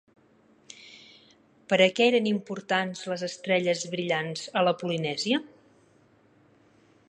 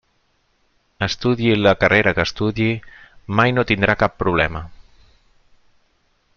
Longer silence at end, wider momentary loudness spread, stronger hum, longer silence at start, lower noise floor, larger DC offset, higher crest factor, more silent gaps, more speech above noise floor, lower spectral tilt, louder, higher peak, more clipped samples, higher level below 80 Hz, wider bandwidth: about the same, 1.6 s vs 1.6 s; about the same, 10 LU vs 10 LU; neither; second, 0.8 s vs 1 s; about the same, -61 dBFS vs -64 dBFS; neither; about the same, 22 dB vs 20 dB; neither; second, 35 dB vs 46 dB; second, -4.5 dB/octave vs -6 dB/octave; second, -26 LUFS vs -18 LUFS; second, -6 dBFS vs 0 dBFS; neither; second, -78 dBFS vs -42 dBFS; first, 10.5 kHz vs 7 kHz